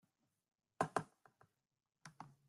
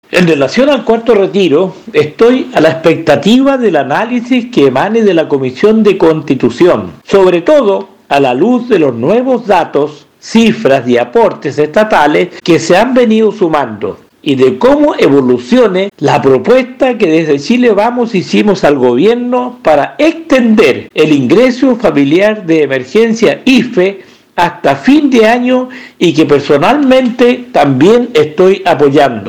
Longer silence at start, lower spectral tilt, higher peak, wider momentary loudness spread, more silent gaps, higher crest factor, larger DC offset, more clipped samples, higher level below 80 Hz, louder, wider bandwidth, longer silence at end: first, 0.8 s vs 0.1 s; about the same, -5 dB/octave vs -6 dB/octave; second, -20 dBFS vs 0 dBFS; first, 21 LU vs 5 LU; neither; first, 30 dB vs 8 dB; second, under 0.1% vs 0.3%; second, under 0.1% vs 4%; second, -84 dBFS vs -44 dBFS; second, -43 LUFS vs -9 LUFS; second, 12.5 kHz vs 14 kHz; first, 0.2 s vs 0 s